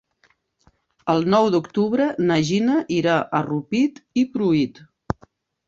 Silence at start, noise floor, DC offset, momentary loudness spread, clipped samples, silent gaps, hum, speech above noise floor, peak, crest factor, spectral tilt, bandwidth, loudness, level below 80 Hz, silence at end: 1.05 s; -63 dBFS; under 0.1%; 12 LU; under 0.1%; none; none; 43 dB; -2 dBFS; 20 dB; -6.5 dB/octave; 7.8 kHz; -21 LUFS; -54 dBFS; 0.55 s